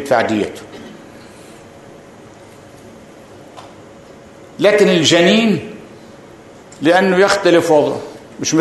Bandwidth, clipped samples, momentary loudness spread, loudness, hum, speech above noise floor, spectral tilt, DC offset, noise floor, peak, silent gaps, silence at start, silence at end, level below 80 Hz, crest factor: 12.5 kHz; under 0.1%; 24 LU; -13 LUFS; none; 27 dB; -4.5 dB/octave; under 0.1%; -39 dBFS; 0 dBFS; none; 0 s; 0 s; -56 dBFS; 16 dB